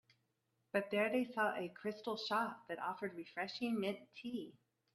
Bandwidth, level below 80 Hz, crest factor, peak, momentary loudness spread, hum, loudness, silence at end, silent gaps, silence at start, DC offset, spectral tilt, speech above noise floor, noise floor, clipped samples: 13.5 kHz; -84 dBFS; 20 dB; -20 dBFS; 10 LU; none; -41 LUFS; 0.45 s; none; 0.75 s; under 0.1%; -5.5 dB/octave; 43 dB; -83 dBFS; under 0.1%